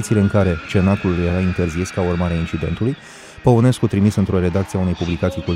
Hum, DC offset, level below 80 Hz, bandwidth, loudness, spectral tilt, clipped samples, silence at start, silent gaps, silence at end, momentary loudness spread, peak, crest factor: none; under 0.1%; -36 dBFS; 13.5 kHz; -18 LUFS; -7 dB/octave; under 0.1%; 0 s; none; 0 s; 7 LU; -2 dBFS; 16 dB